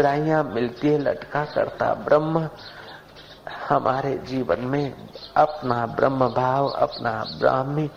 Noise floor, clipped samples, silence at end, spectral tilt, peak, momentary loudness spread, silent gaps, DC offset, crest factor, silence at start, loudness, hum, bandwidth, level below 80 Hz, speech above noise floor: -45 dBFS; under 0.1%; 0 s; -7.5 dB/octave; -4 dBFS; 16 LU; none; under 0.1%; 20 dB; 0 s; -23 LUFS; none; 15 kHz; -54 dBFS; 22 dB